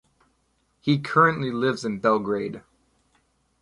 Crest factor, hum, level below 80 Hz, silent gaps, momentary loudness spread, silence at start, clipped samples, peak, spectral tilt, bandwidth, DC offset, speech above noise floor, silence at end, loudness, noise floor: 20 dB; none; -62 dBFS; none; 12 LU; 0.85 s; under 0.1%; -6 dBFS; -6.5 dB/octave; 11.5 kHz; under 0.1%; 46 dB; 1 s; -23 LUFS; -69 dBFS